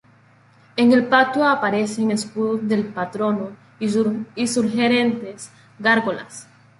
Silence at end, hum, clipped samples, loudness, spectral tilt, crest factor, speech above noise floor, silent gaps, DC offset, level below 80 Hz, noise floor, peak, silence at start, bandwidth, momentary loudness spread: 0.35 s; none; under 0.1%; -20 LUFS; -4.5 dB/octave; 18 dB; 33 dB; none; under 0.1%; -64 dBFS; -53 dBFS; -2 dBFS; 0.75 s; 11.5 kHz; 16 LU